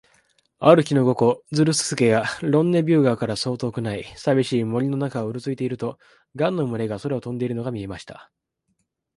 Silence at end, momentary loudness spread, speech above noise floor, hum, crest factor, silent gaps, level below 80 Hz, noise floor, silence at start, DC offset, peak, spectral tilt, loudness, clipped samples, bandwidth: 0.95 s; 11 LU; 52 dB; none; 22 dB; none; -58 dBFS; -73 dBFS; 0.6 s; under 0.1%; 0 dBFS; -6 dB/octave; -22 LUFS; under 0.1%; 11.5 kHz